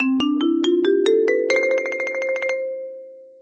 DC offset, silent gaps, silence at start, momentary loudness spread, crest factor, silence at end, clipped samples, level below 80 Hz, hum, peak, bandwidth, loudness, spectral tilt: under 0.1%; none; 0 s; 12 LU; 14 dB; 0.15 s; under 0.1%; -68 dBFS; none; -6 dBFS; 8.6 kHz; -20 LUFS; -3.5 dB/octave